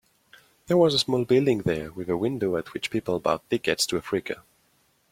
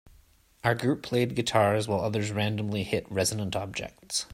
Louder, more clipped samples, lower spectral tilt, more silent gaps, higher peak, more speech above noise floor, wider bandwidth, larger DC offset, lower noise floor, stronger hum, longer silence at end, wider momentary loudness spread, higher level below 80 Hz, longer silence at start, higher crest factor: first, -25 LUFS vs -28 LUFS; neither; about the same, -4.5 dB/octave vs -4.5 dB/octave; neither; about the same, -6 dBFS vs -8 dBFS; first, 41 dB vs 32 dB; about the same, 16.5 kHz vs 16 kHz; neither; first, -66 dBFS vs -60 dBFS; neither; first, 0.75 s vs 0 s; about the same, 9 LU vs 7 LU; about the same, -58 dBFS vs -58 dBFS; first, 0.7 s vs 0.05 s; about the same, 20 dB vs 20 dB